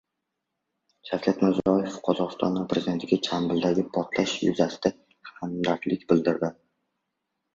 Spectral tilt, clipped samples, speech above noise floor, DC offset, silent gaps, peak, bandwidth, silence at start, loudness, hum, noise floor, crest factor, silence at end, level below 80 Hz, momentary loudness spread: -6 dB/octave; under 0.1%; 57 dB; under 0.1%; none; -6 dBFS; 7.6 kHz; 1.05 s; -26 LUFS; none; -82 dBFS; 20 dB; 1 s; -60 dBFS; 6 LU